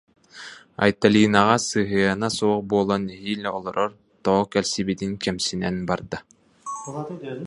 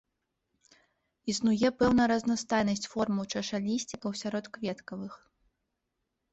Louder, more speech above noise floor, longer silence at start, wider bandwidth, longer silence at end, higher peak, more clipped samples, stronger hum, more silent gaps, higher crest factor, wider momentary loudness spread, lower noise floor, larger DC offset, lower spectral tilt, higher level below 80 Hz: first, -23 LUFS vs -30 LUFS; second, 21 dB vs 53 dB; second, 0.35 s vs 1.25 s; first, 11.5 kHz vs 8.2 kHz; second, 0 s vs 1.15 s; first, 0 dBFS vs -14 dBFS; neither; neither; neither; first, 22 dB vs 16 dB; first, 17 LU vs 14 LU; second, -43 dBFS vs -83 dBFS; neither; about the same, -4.5 dB/octave vs -4.5 dB/octave; first, -54 dBFS vs -60 dBFS